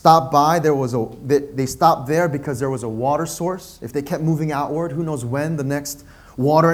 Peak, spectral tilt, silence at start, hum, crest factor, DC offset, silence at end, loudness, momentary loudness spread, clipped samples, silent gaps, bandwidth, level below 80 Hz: 0 dBFS; -6 dB/octave; 0.05 s; none; 18 dB; under 0.1%; 0 s; -20 LUFS; 10 LU; under 0.1%; none; 16.5 kHz; -50 dBFS